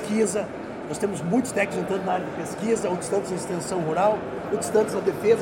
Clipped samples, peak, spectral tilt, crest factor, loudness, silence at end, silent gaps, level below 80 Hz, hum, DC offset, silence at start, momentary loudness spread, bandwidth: under 0.1%; -8 dBFS; -5 dB/octave; 16 dB; -25 LUFS; 0 s; none; -58 dBFS; none; under 0.1%; 0 s; 7 LU; 17 kHz